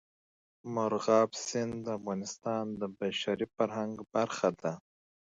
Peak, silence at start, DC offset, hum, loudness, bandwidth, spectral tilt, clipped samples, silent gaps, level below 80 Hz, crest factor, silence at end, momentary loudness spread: -12 dBFS; 0.65 s; under 0.1%; none; -33 LUFS; 7.8 kHz; -4.5 dB/octave; under 0.1%; none; -72 dBFS; 22 dB; 0.45 s; 11 LU